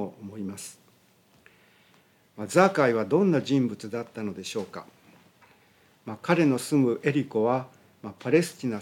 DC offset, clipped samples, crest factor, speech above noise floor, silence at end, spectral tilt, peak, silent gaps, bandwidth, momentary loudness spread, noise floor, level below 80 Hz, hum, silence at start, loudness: under 0.1%; under 0.1%; 22 dB; 36 dB; 0 s; -6 dB/octave; -6 dBFS; none; 17 kHz; 19 LU; -61 dBFS; -78 dBFS; none; 0 s; -26 LUFS